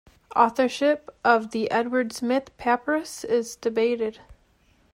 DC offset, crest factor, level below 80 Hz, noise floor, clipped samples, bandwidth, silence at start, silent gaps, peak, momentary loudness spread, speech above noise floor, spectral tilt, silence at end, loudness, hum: under 0.1%; 20 dB; -60 dBFS; -62 dBFS; under 0.1%; 16 kHz; 0.35 s; none; -4 dBFS; 6 LU; 38 dB; -4 dB/octave; 0.6 s; -24 LUFS; none